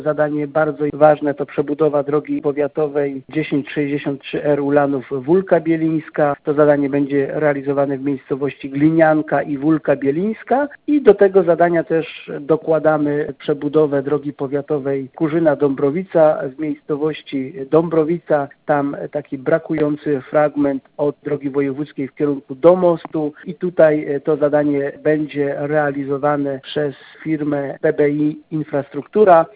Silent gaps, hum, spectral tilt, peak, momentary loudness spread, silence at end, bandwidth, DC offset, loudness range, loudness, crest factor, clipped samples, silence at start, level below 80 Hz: none; none; -11.5 dB/octave; 0 dBFS; 9 LU; 0.1 s; 4 kHz; under 0.1%; 4 LU; -18 LUFS; 16 dB; under 0.1%; 0 s; -58 dBFS